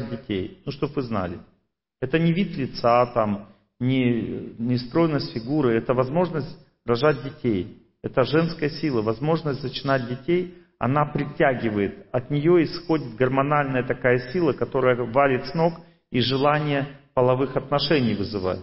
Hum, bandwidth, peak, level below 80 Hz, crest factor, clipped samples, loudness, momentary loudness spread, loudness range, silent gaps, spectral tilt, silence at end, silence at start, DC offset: none; 5.8 kHz; -6 dBFS; -52 dBFS; 18 dB; under 0.1%; -23 LUFS; 9 LU; 2 LU; none; -11 dB/octave; 0 s; 0 s; under 0.1%